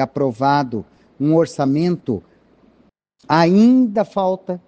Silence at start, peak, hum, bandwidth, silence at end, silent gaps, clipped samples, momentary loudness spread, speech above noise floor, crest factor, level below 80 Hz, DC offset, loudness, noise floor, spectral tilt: 0 s; 0 dBFS; none; 8.8 kHz; 0.1 s; none; under 0.1%; 13 LU; 41 dB; 18 dB; -58 dBFS; under 0.1%; -17 LUFS; -57 dBFS; -7.5 dB/octave